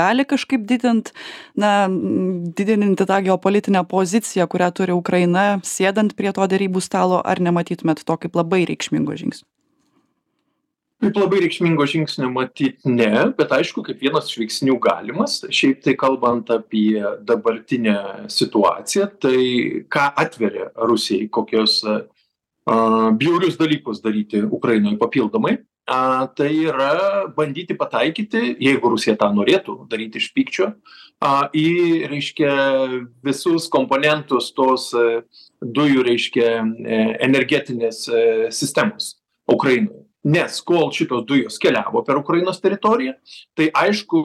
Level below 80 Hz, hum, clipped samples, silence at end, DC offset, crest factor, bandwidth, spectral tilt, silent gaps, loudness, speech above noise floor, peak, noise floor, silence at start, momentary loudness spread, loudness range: -64 dBFS; none; under 0.1%; 0 s; under 0.1%; 16 dB; 14 kHz; -5 dB/octave; none; -19 LUFS; 56 dB; -2 dBFS; -74 dBFS; 0 s; 7 LU; 2 LU